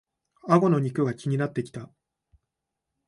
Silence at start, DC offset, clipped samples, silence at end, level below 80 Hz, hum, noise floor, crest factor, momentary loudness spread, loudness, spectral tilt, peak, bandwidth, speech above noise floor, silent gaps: 0.45 s; under 0.1%; under 0.1%; 1.25 s; -68 dBFS; none; -84 dBFS; 20 dB; 19 LU; -25 LUFS; -8.5 dB/octave; -8 dBFS; 11 kHz; 60 dB; none